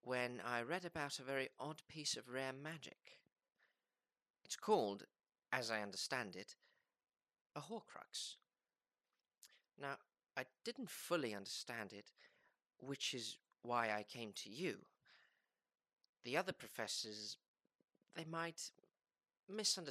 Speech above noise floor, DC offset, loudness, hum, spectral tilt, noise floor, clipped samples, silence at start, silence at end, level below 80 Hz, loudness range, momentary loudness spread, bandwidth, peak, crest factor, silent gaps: over 44 dB; under 0.1%; -46 LUFS; none; -2.5 dB/octave; under -90 dBFS; under 0.1%; 0.05 s; 0 s; under -90 dBFS; 8 LU; 15 LU; 14.5 kHz; -22 dBFS; 26 dB; 4.30-4.34 s, 7.41-7.45 s, 16.09-16.13 s, 17.48-17.54 s, 19.43-19.47 s